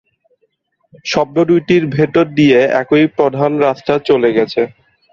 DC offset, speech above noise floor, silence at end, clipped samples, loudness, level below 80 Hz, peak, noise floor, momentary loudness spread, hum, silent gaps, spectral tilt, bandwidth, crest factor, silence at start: under 0.1%; 50 dB; 0.45 s; under 0.1%; -13 LUFS; -52 dBFS; 0 dBFS; -63 dBFS; 7 LU; none; none; -6.5 dB/octave; 7.2 kHz; 14 dB; 1.05 s